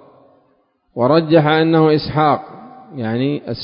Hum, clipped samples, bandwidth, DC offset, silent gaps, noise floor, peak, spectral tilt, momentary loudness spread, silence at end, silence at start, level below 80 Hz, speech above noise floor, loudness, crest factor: none; under 0.1%; 5.4 kHz; under 0.1%; none; -60 dBFS; 0 dBFS; -12 dB/octave; 17 LU; 0 s; 0.95 s; -50 dBFS; 46 dB; -15 LUFS; 16 dB